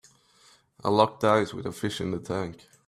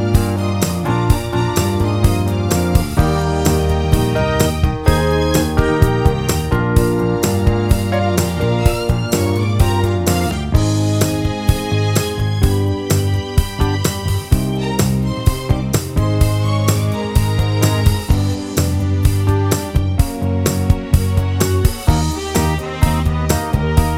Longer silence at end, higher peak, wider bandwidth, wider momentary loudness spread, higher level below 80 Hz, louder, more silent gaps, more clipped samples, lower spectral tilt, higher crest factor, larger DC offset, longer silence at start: first, 0.3 s vs 0 s; second, -6 dBFS vs 0 dBFS; second, 14.5 kHz vs 16.5 kHz; first, 10 LU vs 3 LU; second, -62 dBFS vs -22 dBFS; second, -27 LUFS vs -16 LUFS; neither; neither; about the same, -5.5 dB/octave vs -6 dB/octave; first, 24 dB vs 14 dB; neither; first, 0.85 s vs 0 s